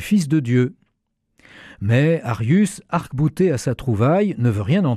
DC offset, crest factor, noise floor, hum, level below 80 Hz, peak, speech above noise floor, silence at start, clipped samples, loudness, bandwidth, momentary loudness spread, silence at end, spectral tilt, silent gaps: under 0.1%; 12 dB; -72 dBFS; none; -48 dBFS; -6 dBFS; 54 dB; 0 s; under 0.1%; -19 LUFS; 14 kHz; 6 LU; 0 s; -7.5 dB/octave; none